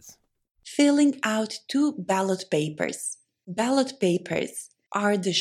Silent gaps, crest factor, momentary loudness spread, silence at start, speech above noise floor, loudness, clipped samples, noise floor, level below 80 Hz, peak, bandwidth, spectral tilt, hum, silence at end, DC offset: 0.51-0.55 s; 16 dB; 12 LU; 0.05 s; 29 dB; -25 LUFS; under 0.1%; -54 dBFS; -74 dBFS; -8 dBFS; 14 kHz; -4.5 dB/octave; none; 0 s; under 0.1%